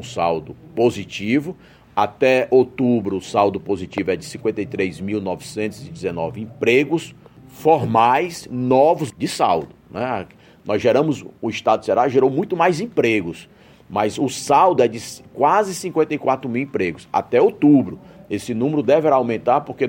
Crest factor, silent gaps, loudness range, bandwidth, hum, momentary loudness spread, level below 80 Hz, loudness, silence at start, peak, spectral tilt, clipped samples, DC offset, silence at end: 16 dB; none; 4 LU; 16.5 kHz; none; 12 LU; -56 dBFS; -19 LUFS; 0 s; -2 dBFS; -6 dB/octave; under 0.1%; under 0.1%; 0 s